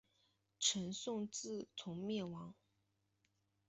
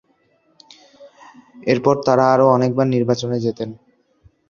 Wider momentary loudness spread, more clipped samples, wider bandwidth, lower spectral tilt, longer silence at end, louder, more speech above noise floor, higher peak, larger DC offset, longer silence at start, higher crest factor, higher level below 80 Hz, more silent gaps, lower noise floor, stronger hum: about the same, 12 LU vs 13 LU; neither; first, 8.2 kHz vs 7.2 kHz; second, -3 dB/octave vs -7 dB/octave; first, 1.15 s vs 0.75 s; second, -42 LUFS vs -17 LUFS; second, 40 dB vs 44 dB; second, -22 dBFS vs -2 dBFS; neither; second, 0.6 s vs 1 s; first, 24 dB vs 18 dB; second, -80 dBFS vs -58 dBFS; neither; first, -83 dBFS vs -61 dBFS; neither